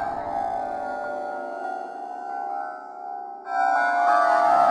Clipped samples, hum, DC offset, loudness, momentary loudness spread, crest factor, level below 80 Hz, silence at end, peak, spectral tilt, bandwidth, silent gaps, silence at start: under 0.1%; none; under 0.1%; -25 LUFS; 16 LU; 16 dB; -62 dBFS; 0 s; -8 dBFS; -4 dB/octave; 11 kHz; none; 0 s